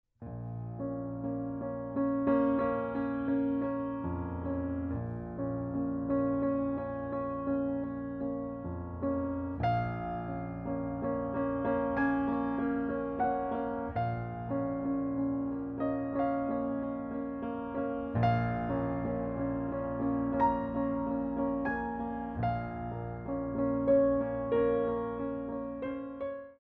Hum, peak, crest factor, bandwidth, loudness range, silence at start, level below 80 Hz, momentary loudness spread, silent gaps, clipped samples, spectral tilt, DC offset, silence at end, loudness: none; -16 dBFS; 16 dB; 4.5 kHz; 3 LU; 0.2 s; -52 dBFS; 8 LU; none; under 0.1%; -8 dB/octave; under 0.1%; 0.05 s; -33 LUFS